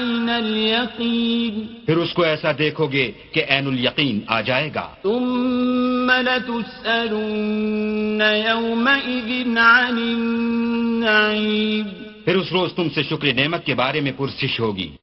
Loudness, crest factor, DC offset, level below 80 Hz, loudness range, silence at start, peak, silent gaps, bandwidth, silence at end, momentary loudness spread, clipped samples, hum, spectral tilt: -19 LUFS; 20 dB; under 0.1%; -54 dBFS; 3 LU; 0 s; 0 dBFS; none; 6 kHz; 0.05 s; 6 LU; under 0.1%; none; -7.5 dB/octave